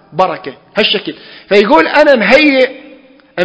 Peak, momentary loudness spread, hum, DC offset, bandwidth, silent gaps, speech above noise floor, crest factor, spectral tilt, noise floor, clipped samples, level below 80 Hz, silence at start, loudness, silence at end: 0 dBFS; 15 LU; none; under 0.1%; 8 kHz; none; 30 dB; 12 dB; -5 dB/octave; -40 dBFS; 1%; -50 dBFS; 0.15 s; -10 LUFS; 0 s